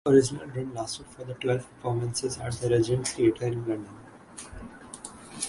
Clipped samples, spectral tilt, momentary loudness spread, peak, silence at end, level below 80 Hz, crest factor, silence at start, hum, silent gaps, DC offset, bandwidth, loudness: under 0.1%; -5.5 dB/octave; 19 LU; -8 dBFS; 0 s; -54 dBFS; 20 dB; 0.05 s; none; none; under 0.1%; 11.5 kHz; -28 LUFS